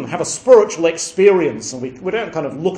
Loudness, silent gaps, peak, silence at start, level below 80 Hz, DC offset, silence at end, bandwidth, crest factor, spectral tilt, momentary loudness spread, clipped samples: -16 LUFS; none; 0 dBFS; 0 s; -56 dBFS; under 0.1%; 0 s; 10.5 kHz; 16 dB; -4 dB/octave; 14 LU; under 0.1%